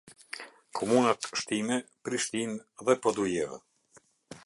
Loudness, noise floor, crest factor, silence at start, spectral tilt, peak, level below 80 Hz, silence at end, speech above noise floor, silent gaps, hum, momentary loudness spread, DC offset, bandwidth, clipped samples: -30 LUFS; -63 dBFS; 22 dB; 0.05 s; -3.5 dB/octave; -10 dBFS; -70 dBFS; 0.05 s; 34 dB; none; none; 17 LU; under 0.1%; 11.5 kHz; under 0.1%